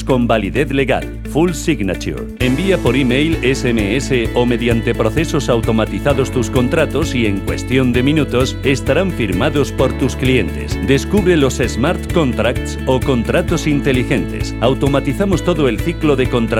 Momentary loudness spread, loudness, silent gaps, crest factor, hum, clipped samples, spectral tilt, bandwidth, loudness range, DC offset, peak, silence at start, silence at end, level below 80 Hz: 4 LU; -16 LUFS; none; 14 dB; none; under 0.1%; -6 dB/octave; 17 kHz; 1 LU; 0.1%; 0 dBFS; 0 s; 0 s; -26 dBFS